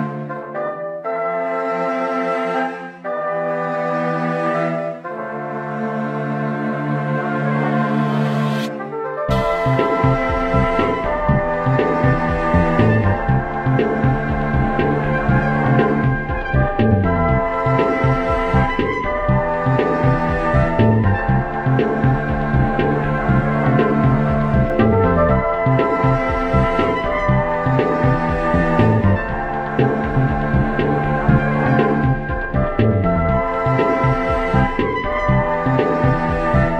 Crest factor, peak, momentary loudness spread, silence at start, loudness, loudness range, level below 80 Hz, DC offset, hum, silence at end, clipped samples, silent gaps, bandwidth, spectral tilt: 16 dB; -2 dBFS; 7 LU; 0 s; -18 LUFS; 5 LU; -30 dBFS; under 0.1%; none; 0 s; under 0.1%; none; 7.8 kHz; -9 dB/octave